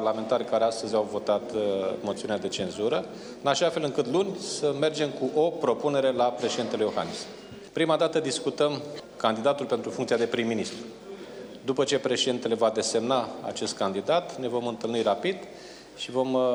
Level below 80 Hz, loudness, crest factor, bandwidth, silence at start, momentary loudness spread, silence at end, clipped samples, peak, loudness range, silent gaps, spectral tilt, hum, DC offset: -68 dBFS; -27 LUFS; 20 dB; 19.5 kHz; 0 s; 12 LU; 0 s; under 0.1%; -8 dBFS; 2 LU; none; -4 dB/octave; none; under 0.1%